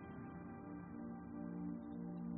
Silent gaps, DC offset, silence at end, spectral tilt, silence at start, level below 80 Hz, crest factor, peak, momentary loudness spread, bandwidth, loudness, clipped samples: none; under 0.1%; 0 s; -7 dB/octave; 0 s; -70 dBFS; 12 dB; -36 dBFS; 5 LU; 3.2 kHz; -50 LUFS; under 0.1%